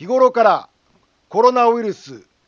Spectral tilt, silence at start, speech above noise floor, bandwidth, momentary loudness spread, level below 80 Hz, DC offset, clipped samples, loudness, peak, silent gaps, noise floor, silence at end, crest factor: -5 dB/octave; 0 s; 44 dB; 7 kHz; 12 LU; -70 dBFS; under 0.1%; under 0.1%; -16 LUFS; 0 dBFS; none; -60 dBFS; 0.3 s; 16 dB